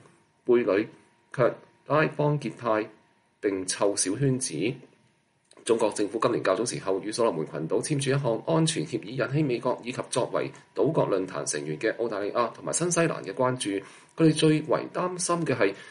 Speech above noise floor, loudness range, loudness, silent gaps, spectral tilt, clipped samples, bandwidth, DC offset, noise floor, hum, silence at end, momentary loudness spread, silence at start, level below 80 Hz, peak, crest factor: 40 dB; 2 LU; -27 LUFS; none; -5 dB/octave; under 0.1%; 11.5 kHz; under 0.1%; -67 dBFS; none; 0 s; 8 LU; 0.45 s; -70 dBFS; -10 dBFS; 18 dB